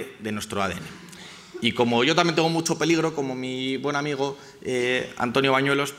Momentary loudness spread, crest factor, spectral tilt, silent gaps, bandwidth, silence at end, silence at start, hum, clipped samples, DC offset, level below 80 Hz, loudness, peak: 16 LU; 22 dB; -4.5 dB/octave; none; 16 kHz; 0 s; 0 s; none; under 0.1%; under 0.1%; -62 dBFS; -24 LUFS; -4 dBFS